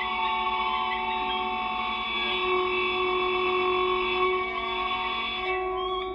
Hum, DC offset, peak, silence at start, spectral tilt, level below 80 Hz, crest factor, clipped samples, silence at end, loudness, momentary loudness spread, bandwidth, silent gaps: none; under 0.1%; -14 dBFS; 0 s; -5.5 dB/octave; -50 dBFS; 14 dB; under 0.1%; 0 s; -26 LUFS; 4 LU; 5.8 kHz; none